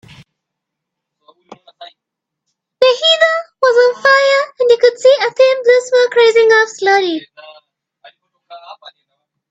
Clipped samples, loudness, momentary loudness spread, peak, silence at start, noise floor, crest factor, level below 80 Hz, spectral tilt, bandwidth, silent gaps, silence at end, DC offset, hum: under 0.1%; -11 LUFS; 4 LU; 0 dBFS; 1.8 s; -80 dBFS; 14 dB; -66 dBFS; -1 dB/octave; 8 kHz; none; 0.6 s; under 0.1%; none